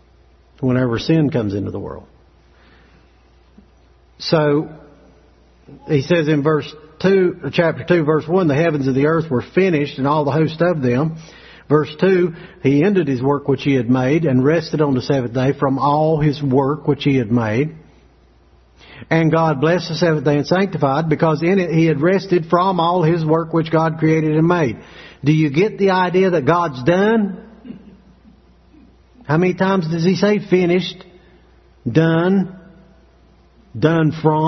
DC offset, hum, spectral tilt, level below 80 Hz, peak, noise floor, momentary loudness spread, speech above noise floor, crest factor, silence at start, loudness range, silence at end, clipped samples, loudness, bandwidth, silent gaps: under 0.1%; none; -8 dB/octave; -50 dBFS; 0 dBFS; -51 dBFS; 6 LU; 35 dB; 16 dB; 0.6 s; 6 LU; 0 s; under 0.1%; -17 LUFS; 6.4 kHz; none